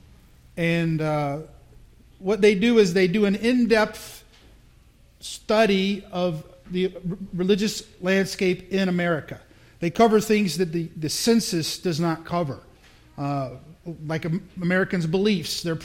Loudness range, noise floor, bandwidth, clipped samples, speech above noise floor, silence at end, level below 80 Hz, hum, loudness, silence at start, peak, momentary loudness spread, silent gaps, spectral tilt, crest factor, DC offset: 5 LU; -54 dBFS; 16.5 kHz; under 0.1%; 31 dB; 0 s; -52 dBFS; none; -23 LUFS; 0.55 s; -6 dBFS; 16 LU; none; -5.5 dB/octave; 18 dB; under 0.1%